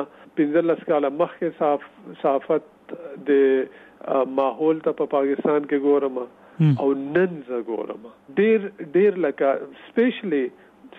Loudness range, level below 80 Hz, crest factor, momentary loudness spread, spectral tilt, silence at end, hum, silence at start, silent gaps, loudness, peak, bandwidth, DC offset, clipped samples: 2 LU; -74 dBFS; 14 dB; 12 LU; -10 dB/octave; 0 s; none; 0 s; none; -22 LUFS; -8 dBFS; 4 kHz; under 0.1%; under 0.1%